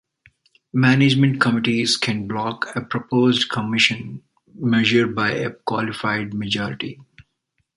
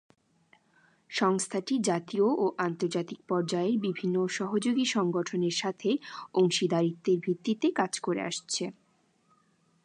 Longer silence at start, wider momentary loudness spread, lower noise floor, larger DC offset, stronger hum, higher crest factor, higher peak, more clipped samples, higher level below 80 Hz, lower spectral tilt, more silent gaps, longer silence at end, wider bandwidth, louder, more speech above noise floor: second, 0.75 s vs 1.1 s; first, 11 LU vs 6 LU; about the same, -72 dBFS vs -69 dBFS; neither; neither; about the same, 20 dB vs 18 dB; first, -2 dBFS vs -12 dBFS; neither; first, -58 dBFS vs -80 dBFS; about the same, -5 dB/octave vs -4.5 dB/octave; neither; second, 0.55 s vs 1.15 s; about the same, 11.5 kHz vs 11 kHz; first, -20 LUFS vs -29 LUFS; first, 52 dB vs 40 dB